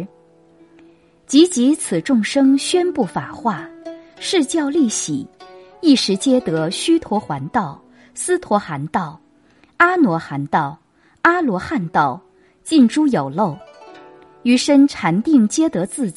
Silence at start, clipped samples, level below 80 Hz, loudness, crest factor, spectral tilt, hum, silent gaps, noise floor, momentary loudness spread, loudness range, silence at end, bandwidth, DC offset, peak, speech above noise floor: 0 s; under 0.1%; -58 dBFS; -17 LUFS; 18 dB; -4.5 dB/octave; none; none; -53 dBFS; 13 LU; 3 LU; 0.05 s; 11.5 kHz; under 0.1%; 0 dBFS; 37 dB